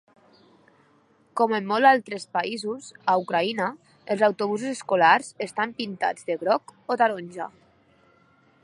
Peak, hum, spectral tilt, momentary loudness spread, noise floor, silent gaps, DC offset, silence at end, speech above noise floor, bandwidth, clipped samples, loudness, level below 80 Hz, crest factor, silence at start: -4 dBFS; none; -4.5 dB/octave; 14 LU; -61 dBFS; none; under 0.1%; 1.15 s; 37 dB; 11.5 kHz; under 0.1%; -24 LUFS; -78 dBFS; 22 dB; 1.35 s